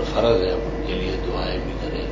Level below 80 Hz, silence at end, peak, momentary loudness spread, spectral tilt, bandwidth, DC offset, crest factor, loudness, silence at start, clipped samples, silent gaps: -30 dBFS; 0 s; -4 dBFS; 8 LU; -6.5 dB/octave; 7.6 kHz; under 0.1%; 18 dB; -24 LUFS; 0 s; under 0.1%; none